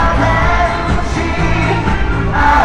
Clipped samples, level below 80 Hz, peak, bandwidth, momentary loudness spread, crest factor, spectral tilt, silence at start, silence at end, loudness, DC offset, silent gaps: under 0.1%; -18 dBFS; 0 dBFS; 10 kHz; 4 LU; 12 dB; -6 dB/octave; 0 s; 0 s; -14 LUFS; under 0.1%; none